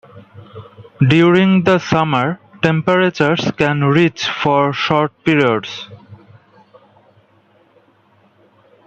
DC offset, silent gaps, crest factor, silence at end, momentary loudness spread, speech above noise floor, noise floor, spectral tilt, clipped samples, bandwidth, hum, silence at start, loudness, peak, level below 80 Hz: under 0.1%; none; 16 dB; 2.7 s; 8 LU; 40 dB; -54 dBFS; -6.5 dB/octave; under 0.1%; 8 kHz; none; 0.15 s; -14 LUFS; -2 dBFS; -54 dBFS